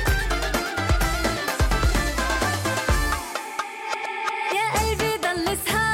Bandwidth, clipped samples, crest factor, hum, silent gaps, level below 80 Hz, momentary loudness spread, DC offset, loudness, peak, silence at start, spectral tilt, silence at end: 17 kHz; under 0.1%; 12 dB; none; none; -28 dBFS; 6 LU; under 0.1%; -24 LUFS; -10 dBFS; 0 s; -4 dB/octave; 0 s